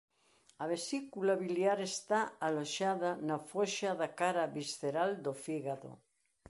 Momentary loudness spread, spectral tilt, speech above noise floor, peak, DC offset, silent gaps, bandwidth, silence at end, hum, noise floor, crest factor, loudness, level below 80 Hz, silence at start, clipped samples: 7 LU; -4 dB/octave; 34 dB; -18 dBFS; under 0.1%; none; 11.5 kHz; 0.55 s; none; -70 dBFS; 18 dB; -36 LUFS; -78 dBFS; 0.6 s; under 0.1%